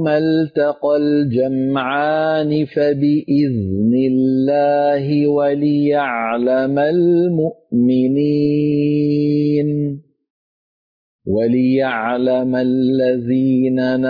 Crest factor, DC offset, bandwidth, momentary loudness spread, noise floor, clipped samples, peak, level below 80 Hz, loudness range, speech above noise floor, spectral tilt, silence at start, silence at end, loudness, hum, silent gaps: 10 dB; under 0.1%; 5 kHz; 3 LU; under -90 dBFS; under 0.1%; -6 dBFS; -56 dBFS; 3 LU; over 75 dB; -10 dB/octave; 0 s; 0 s; -16 LUFS; none; 10.30-11.19 s